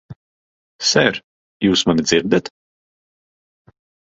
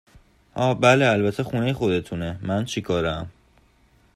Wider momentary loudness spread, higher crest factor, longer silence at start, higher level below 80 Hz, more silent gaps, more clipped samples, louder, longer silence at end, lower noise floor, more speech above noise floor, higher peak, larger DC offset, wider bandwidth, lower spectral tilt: second, 8 LU vs 13 LU; about the same, 20 dB vs 20 dB; second, 0.1 s vs 0.55 s; about the same, -52 dBFS vs -50 dBFS; first, 0.16-0.79 s, 1.24-1.60 s vs none; neither; first, -17 LUFS vs -22 LUFS; first, 1.55 s vs 0.85 s; first, under -90 dBFS vs -59 dBFS; first, over 74 dB vs 37 dB; first, 0 dBFS vs -4 dBFS; neither; second, 8 kHz vs 14 kHz; second, -3.5 dB/octave vs -6 dB/octave